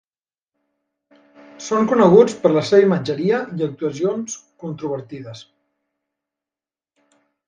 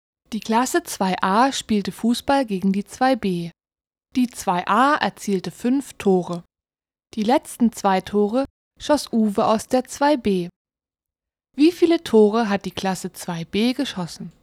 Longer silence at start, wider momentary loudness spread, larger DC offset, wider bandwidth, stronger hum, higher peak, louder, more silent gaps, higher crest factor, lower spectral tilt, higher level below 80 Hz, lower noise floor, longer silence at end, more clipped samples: first, 1.6 s vs 0.3 s; first, 20 LU vs 12 LU; neither; second, 9.6 kHz vs 16 kHz; neither; about the same, 0 dBFS vs -2 dBFS; first, -18 LUFS vs -21 LUFS; second, none vs 8.50-8.71 s, 10.56-10.65 s; about the same, 20 dB vs 20 dB; about the same, -6 dB/octave vs -5 dB/octave; second, -64 dBFS vs -54 dBFS; about the same, under -90 dBFS vs under -90 dBFS; first, 2.05 s vs 0.15 s; neither